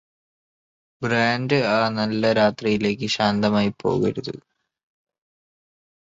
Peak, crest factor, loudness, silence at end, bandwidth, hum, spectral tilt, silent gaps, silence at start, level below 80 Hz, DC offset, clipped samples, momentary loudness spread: -4 dBFS; 18 dB; -21 LUFS; 1.7 s; 7.8 kHz; none; -6 dB/octave; none; 1 s; -56 dBFS; under 0.1%; under 0.1%; 8 LU